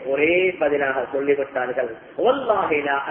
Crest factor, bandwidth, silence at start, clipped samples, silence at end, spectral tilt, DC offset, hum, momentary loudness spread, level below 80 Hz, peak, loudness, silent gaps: 14 dB; 3.7 kHz; 0 s; under 0.1%; 0 s; -9 dB/octave; under 0.1%; none; 6 LU; -58 dBFS; -6 dBFS; -21 LUFS; none